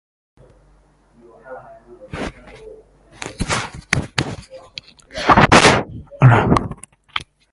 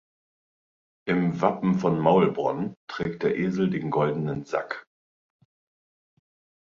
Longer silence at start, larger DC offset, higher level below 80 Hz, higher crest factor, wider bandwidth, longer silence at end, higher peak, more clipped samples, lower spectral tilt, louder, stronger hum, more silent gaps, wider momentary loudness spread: first, 1.45 s vs 1.05 s; neither; first, -36 dBFS vs -60 dBFS; about the same, 20 dB vs 22 dB; first, 11.5 kHz vs 7.2 kHz; second, 0.35 s vs 1.85 s; first, 0 dBFS vs -6 dBFS; neither; second, -5 dB/octave vs -8 dB/octave; first, -16 LUFS vs -25 LUFS; neither; second, none vs 2.77-2.87 s; first, 25 LU vs 11 LU